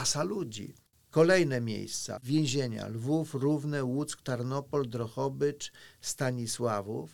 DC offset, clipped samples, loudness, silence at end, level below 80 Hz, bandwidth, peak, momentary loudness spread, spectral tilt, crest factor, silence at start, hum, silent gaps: 0.1%; under 0.1%; -31 LUFS; 0 s; -66 dBFS; 19 kHz; -12 dBFS; 10 LU; -5 dB/octave; 18 dB; 0 s; none; none